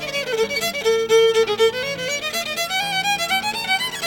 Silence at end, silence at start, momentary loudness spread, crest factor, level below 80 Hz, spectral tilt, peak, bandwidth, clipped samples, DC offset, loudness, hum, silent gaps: 0 s; 0 s; 7 LU; 14 dB; -56 dBFS; -1.5 dB/octave; -6 dBFS; over 20 kHz; under 0.1%; under 0.1%; -19 LUFS; none; none